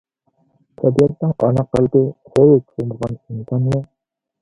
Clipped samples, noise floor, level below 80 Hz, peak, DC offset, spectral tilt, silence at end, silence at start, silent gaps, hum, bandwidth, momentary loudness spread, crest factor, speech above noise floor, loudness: under 0.1%; -79 dBFS; -48 dBFS; 0 dBFS; under 0.1%; -9.5 dB/octave; 0.6 s; 0.8 s; none; none; 11 kHz; 13 LU; 18 dB; 63 dB; -17 LUFS